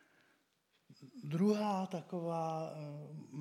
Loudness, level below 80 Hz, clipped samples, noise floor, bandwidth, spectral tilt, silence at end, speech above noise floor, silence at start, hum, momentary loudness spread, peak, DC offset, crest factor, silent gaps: -38 LUFS; under -90 dBFS; under 0.1%; -78 dBFS; 12.5 kHz; -7.5 dB/octave; 0 s; 40 dB; 0.9 s; none; 16 LU; -22 dBFS; under 0.1%; 18 dB; none